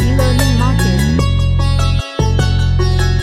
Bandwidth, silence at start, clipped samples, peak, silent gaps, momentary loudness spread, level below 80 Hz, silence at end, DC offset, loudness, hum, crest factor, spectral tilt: 15 kHz; 0 s; under 0.1%; 0 dBFS; none; 3 LU; -18 dBFS; 0 s; under 0.1%; -14 LUFS; none; 12 dB; -6 dB/octave